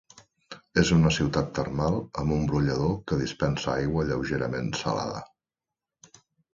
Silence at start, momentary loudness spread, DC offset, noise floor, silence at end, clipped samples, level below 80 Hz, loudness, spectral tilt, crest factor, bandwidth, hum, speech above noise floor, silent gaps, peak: 0.5 s; 8 LU; under 0.1%; -90 dBFS; 1.3 s; under 0.1%; -44 dBFS; -27 LUFS; -6 dB/octave; 20 dB; 7.6 kHz; none; 64 dB; none; -6 dBFS